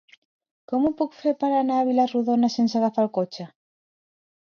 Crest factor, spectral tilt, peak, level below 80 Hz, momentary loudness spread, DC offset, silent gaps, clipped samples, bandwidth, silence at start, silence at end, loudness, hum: 14 dB; -6.5 dB/octave; -10 dBFS; -66 dBFS; 8 LU; under 0.1%; none; under 0.1%; 7 kHz; 0.7 s; 1 s; -23 LUFS; none